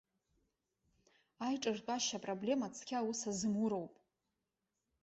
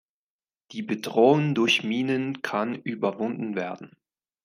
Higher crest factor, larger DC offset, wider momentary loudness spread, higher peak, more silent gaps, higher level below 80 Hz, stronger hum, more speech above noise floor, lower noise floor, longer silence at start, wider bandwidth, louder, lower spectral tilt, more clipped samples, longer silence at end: about the same, 18 dB vs 20 dB; neither; second, 5 LU vs 14 LU; second, -24 dBFS vs -6 dBFS; neither; about the same, -78 dBFS vs -76 dBFS; neither; second, 50 dB vs over 65 dB; about the same, -89 dBFS vs under -90 dBFS; first, 1.4 s vs 0.7 s; second, 8 kHz vs 15.5 kHz; second, -39 LUFS vs -25 LUFS; second, -4 dB/octave vs -5.5 dB/octave; neither; first, 1.1 s vs 0.55 s